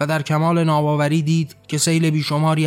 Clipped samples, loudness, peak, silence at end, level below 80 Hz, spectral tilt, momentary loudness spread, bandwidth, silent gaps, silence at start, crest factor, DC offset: under 0.1%; -18 LUFS; -6 dBFS; 0 s; -64 dBFS; -5.5 dB/octave; 4 LU; 15.5 kHz; none; 0 s; 12 dB; under 0.1%